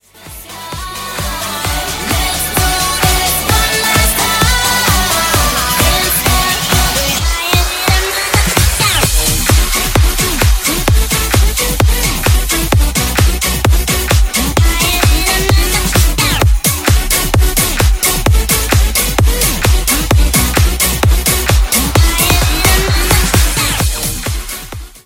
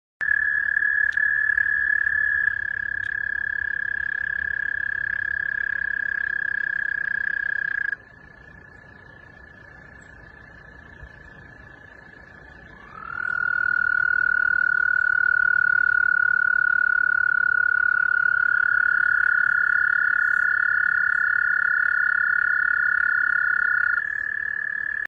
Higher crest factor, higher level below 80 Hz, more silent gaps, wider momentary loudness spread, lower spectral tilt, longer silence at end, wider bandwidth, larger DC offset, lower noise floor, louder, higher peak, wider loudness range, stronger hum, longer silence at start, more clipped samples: about the same, 12 dB vs 14 dB; first, -16 dBFS vs -56 dBFS; neither; about the same, 6 LU vs 6 LU; about the same, -3 dB/octave vs -4 dB/octave; about the same, 0.1 s vs 0 s; first, 17.5 kHz vs 5.2 kHz; neither; second, -33 dBFS vs -47 dBFS; first, -11 LUFS vs -21 LUFS; first, 0 dBFS vs -8 dBFS; second, 2 LU vs 9 LU; neither; about the same, 0.2 s vs 0.2 s; neither